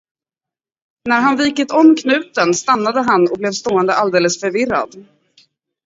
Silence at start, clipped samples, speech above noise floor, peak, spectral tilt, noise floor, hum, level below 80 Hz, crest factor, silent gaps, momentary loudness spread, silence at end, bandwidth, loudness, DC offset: 1.05 s; under 0.1%; 73 dB; 0 dBFS; -4 dB/octave; -88 dBFS; none; -58 dBFS; 16 dB; none; 7 LU; 0.85 s; 7.8 kHz; -15 LUFS; under 0.1%